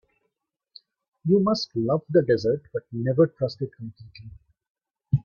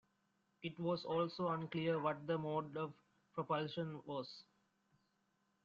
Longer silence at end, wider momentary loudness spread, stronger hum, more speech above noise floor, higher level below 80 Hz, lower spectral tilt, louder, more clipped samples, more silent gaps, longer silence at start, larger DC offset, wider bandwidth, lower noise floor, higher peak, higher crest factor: second, 0.05 s vs 1.2 s; first, 18 LU vs 11 LU; neither; first, 55 dB vs 40 dB; first, -56 dBFS vs -80 dBFS; first, -8 dB/octave vs -5 dB/octave; first, -24 LUFS vs -42 LUFS; neither; first, 4.70-4.75 s vs none; first, 1.25 s vs 0.6 s; neither; about the same, 7 kHz vs 7.4 kHz; about the same, -79 dBFS vs -82 dBFS; first, -6 dBFS vs -24 dBFS; about the same, 18 dB vs 18 dB